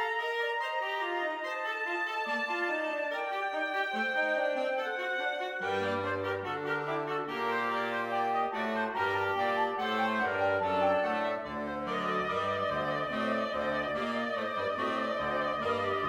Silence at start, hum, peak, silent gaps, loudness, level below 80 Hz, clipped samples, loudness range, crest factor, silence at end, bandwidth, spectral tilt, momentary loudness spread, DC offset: 0 s; none; -18 dBFS; none; -31 LUFS; -66 dBFS; under 0.1%; 2 LU; 14 dB; 0 s; 16.5 kHz; -5 dB/octave; 4 LU; under 0.1%